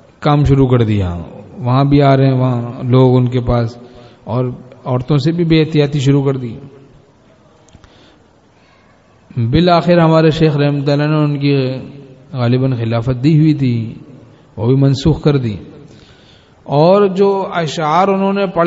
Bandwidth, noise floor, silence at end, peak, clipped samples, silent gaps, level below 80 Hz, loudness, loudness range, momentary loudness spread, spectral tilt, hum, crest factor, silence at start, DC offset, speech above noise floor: 7.8 kHz; -48 dBFS; 0 s; 0 dBFS; under 0.1%; none; -36 dBFS; -13 LUFS; 5 LU; 13 LU; -8 dB/octave; none; 14 dB; 0.2 s; under 0.1%; 36 dB